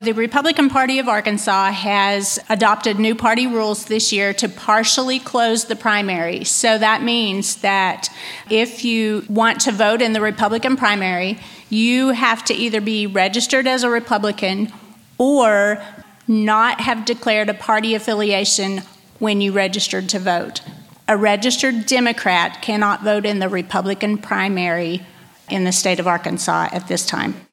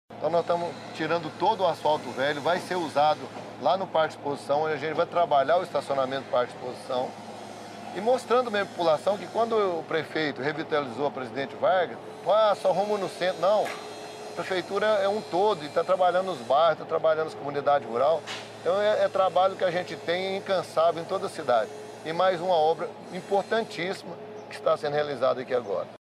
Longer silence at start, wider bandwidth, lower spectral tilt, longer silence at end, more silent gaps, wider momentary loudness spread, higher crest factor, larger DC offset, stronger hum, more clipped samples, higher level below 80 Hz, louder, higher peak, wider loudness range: about the same, 0 s vs 0.1 s; first, 16 kHz vs 13 kHz; second, -3 dB/octave vs -5 dB/octave; about the same, 0.15 s vs 0.1 s; neither; second, 6 LU vs 10 LU; about the same, 18 dB vs 16 dB; neither; neither; neither; first, -62 dBFS vs -74 dBFS; first, -17 LUFS vs -26 LUFS; first, 0 dBFS vs -12 dBFS; about the same, 3 LU vs 3 LU